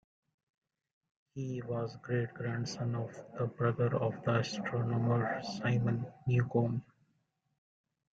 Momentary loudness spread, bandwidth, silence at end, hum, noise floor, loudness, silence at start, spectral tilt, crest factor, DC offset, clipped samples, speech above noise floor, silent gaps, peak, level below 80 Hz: 9 LU; 7.6 kHz; 1.3 s; none; -78 dBFS; -35 LUFS; 1.35 s; -7 dB/octave; 18 dB; under 0.1%; under 0.1%; 45 dB; none; -18 dBFS; -68 dBFS